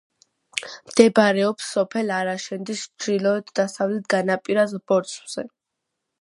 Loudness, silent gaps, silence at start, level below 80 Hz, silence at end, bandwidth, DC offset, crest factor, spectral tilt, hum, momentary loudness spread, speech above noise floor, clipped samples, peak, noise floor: -22 LUFS; none; 0.55 s; -70 dBFS; 0.75 s; 11.5 kHz; under 0.1%; 22 dB; -4.5 dB/octave; none; 14 LU; 59 dB; under 0.1%; 0 dBFS; -81 dBFS